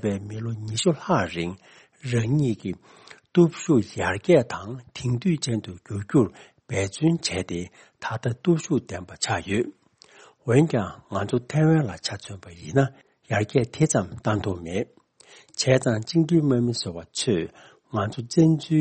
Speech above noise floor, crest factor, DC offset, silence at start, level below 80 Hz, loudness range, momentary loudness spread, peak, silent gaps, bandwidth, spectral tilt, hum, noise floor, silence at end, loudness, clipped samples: 29 dB; 18 dB; under 0.1%; 0.05 s; -56 dBFS; 3 LU; 14 LU; -6 dBFS; none; 8.8 kHz; -6 dB/octave; none; -53 dBFS; 0 s; -24 LUFS; under 0.1%